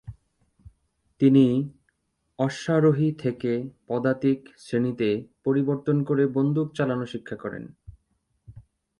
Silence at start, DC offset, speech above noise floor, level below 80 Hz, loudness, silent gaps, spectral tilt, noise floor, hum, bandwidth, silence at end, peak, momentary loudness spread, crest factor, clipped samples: 0.05 s; under 0.1%; 49 dB; -60 dBFS; -24 LUFS; none; -8 dB/octave; -72 dBFS; none; 10.5 kHz; 0.4 s; -6 dBFS; 14 LU; 18 dB; under 0.1%